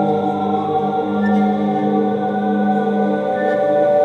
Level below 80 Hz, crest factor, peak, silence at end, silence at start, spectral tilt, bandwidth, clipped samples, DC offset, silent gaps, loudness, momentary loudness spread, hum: -60 dBFS; 12 dB; -4 dBFS; 0 s; 0 s; -9 dB/octave; 6.4 kHz; under 0.1%; under 0.1%; none; -17 LUFS; 3 LU; 50 Hz at -45 dBFS